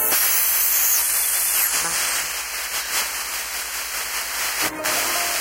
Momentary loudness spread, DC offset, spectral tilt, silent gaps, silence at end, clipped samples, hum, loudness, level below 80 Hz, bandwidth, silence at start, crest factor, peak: 9 LU; under 0.1%; 1.5 dB/octave; none; 0 s; under 0.1%; none; -19 LUFS; -52 dBFS; 16.5 kHz; 0 s; 16 dB; -6 dBFS